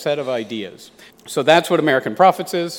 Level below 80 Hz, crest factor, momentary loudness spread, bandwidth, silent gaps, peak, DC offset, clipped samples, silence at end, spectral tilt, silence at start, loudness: -66 dBFS; 18 dB; 14 LU; 17.5 kHz; none; 0 dBFS; under 0.1%; under 0.1%; 0 s; -4.5 dB/octave; 0 s; -17 LUFS